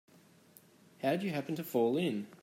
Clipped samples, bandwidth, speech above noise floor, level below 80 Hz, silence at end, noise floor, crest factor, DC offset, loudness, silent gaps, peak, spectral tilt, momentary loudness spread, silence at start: under 0.1%; 16 kHz; 29 dB; -82 dBFS; 0.05 s; -62 dBFS; 18 dB; under 0.1%; -34 LUFS; none; -18 dBFS; -6.5 dB/octave; 6 LU; 1 s